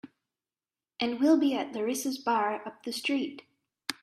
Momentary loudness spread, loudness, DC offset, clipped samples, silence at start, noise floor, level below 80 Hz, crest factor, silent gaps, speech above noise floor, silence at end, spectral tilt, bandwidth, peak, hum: 13 LU; -29 LUFS; under 0.1%; under 0.1%; 0.05 s; under -90 dBFS; -78 dBFS; 22 dB; none; over 61 dB; 0.1 s; -3 dB/octave; 15 kHz; -10 dBFS; none